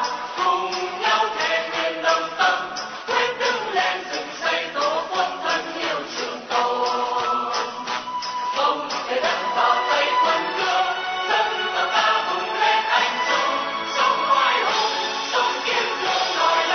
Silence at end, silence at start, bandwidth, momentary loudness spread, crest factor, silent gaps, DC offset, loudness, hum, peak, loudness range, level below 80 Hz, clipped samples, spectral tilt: 0 s; 0 s; 6.6 kHz; 7 LU; 16 dB; none; under 0.1%; -21 LUFS; none; -6 dBFS; 4 LU; -66 dBFS; under 0.1%; -1 dB/octave